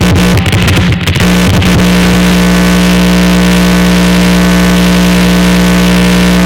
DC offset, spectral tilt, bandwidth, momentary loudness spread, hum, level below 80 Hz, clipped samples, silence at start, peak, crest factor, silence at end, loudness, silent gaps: 0.4%; -5.5 dB/octave; 17 kHz; 1 LU; 60 Hz at -10 dBFS; -18 dBFS; under 0.1%; 0 s; -2 dBFS; 6 dB; 0 s; -7 LUFS; none